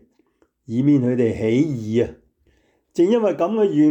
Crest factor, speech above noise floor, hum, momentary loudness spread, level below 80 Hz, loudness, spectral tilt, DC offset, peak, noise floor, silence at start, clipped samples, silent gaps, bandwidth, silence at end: 12 dB; 45 dB; none; 7 LU; -56 dBFS; -20 LUFS; -8.5 dB/octave; under 0.1%; -8 dBFS; -63 dBFS; 0.7 s; under 0.1%; none; 8.4 kHz; 0 s